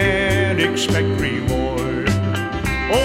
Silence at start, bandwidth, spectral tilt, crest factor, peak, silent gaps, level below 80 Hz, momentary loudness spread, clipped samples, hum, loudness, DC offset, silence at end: 0 s; 16 kHz; -5 dB/octave; 16 dB; -2 dBFS; none; -32 dBFS; 5 LU; under 0.1%; none; -19 LUFS; under 0.1%; 0 s